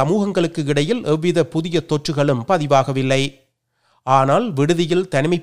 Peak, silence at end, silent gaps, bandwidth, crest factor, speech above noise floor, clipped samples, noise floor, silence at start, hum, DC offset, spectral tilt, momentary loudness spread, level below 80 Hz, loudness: 0 dBFS; 0 s; none; 12 kHz; 16 dB; 47 dB; under 0.1%; -65 dBFS; 0 s; none; 0.8%; -6 dB/octave; 5 LU; -54 dBFS; -18 LUFS